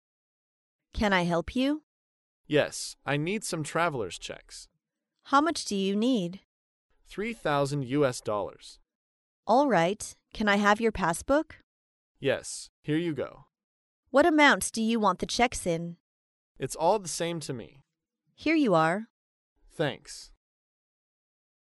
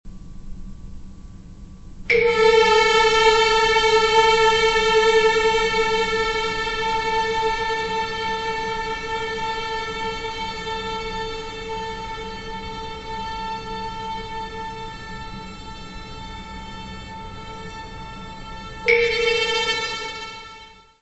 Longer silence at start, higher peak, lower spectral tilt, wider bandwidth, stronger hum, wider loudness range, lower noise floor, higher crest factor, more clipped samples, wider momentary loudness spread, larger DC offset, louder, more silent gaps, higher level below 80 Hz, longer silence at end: first, 0.95 s vs 0.05 s; second, -8 dBFS vs -4 dBFS; first, -4.5 dB/octave vs -2.5 dB/octave; first, 11.5 kHz vs 8.4 kHz; neither; second, 5 LU vs 17 LU; first, -82 dBFS vs -44 dBFS; about the same, 22 dB vs 20 dB; neither; second, 16 LU vs 20 LU; neither; second, -27 LUFS vs -20 LUFS; first, 1.83-2.44 s, 6.45-6.89 s, 8.95-9.43 s, 11.63-12.15 s, 12.69-12.83 s, 13.64-14.03 s, 16.00-16.55 s, 19.10-19.56 s vs none; second, -54 dBFS vs -40 dBFS; first, 1.55 s vs 0.3 s